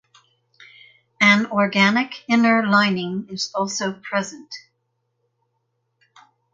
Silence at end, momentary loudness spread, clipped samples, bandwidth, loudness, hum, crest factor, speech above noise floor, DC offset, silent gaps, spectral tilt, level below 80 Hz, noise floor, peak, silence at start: 1.95 s; 14 LU; under 0.1%; 7.8 kHz; -19 LUFS; none; 22 dB; 52 dB; under 0.1%; none; -4 dB/octave; -68 dBFS; -73 dBFS; 0 dBFS; 1.2 s